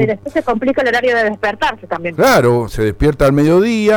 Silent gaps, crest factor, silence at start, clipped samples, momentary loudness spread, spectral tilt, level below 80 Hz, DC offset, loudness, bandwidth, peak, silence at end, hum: none; 12 dB; 0 s; under 0.1%; 8 LU; -6 dB/octave; -32 dBFS; under 0.1%; -14 LUFS; over 20 kHz; 0 dBFS; 0 s; none